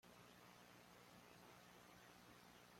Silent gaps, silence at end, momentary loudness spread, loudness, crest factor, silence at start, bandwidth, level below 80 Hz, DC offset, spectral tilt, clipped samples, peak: none; 0 s; 1 LU; -65 LUFS; 16 dB; 0.05 s; 16.5 kHz; -86 dBFS; under 0.1%; -3.5 dB/octave; under 0.1%; -50 dBFS